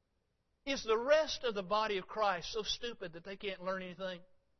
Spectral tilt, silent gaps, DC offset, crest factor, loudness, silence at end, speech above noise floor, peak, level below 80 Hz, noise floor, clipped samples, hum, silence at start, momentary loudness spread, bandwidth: -1.5 dB/octave; none; under 0.1%; 20 dB; -36 LUFS; 0.35 s; 44 dB; -18 dBFS; -62 dBFS; -80 dBFS; under 0.1%; none; 0.65 s; 14 LU; 6.2 kHz